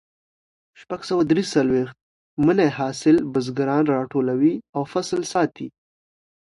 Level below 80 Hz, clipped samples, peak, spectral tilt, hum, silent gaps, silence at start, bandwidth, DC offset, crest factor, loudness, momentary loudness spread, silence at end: -58 dBFS; under 0.1%; -6 dBFS; -6 dB/octave; none; 2.01-2.37 s, 4.69-4.73 s; 0.8 s; 11.5 kHz; under 0.1%; 16 dB; -21 LUFS; 14 LU; 0.8 s